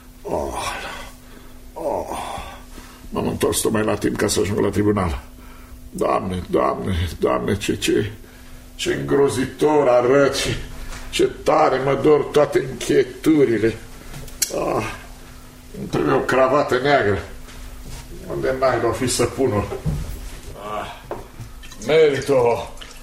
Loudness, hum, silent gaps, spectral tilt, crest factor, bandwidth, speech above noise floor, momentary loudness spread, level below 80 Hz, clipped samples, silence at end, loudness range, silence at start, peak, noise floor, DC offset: -20 LUFS; none; none; -5 dB/octave; 20 dB; 16 kHz; 21 dB; 20 LU; -38 dBFS; under 0.1%; 0 s; 5 LU; 0 s; -2 dBFS; -40 dBFS; under 0.1%